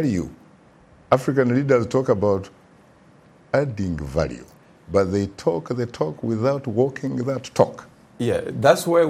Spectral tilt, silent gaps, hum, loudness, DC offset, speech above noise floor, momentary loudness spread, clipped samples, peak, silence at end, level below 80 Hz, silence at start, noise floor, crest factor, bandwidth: -6.5 dB/octave; none; none; -22 LUFS; under 0.1%; 31 dB; 9 LU; under 0.1%; 0 dBFS; 0 s; -48 dBFS; 0 s; -52 dBFS; 22 dB; 15.5 kHz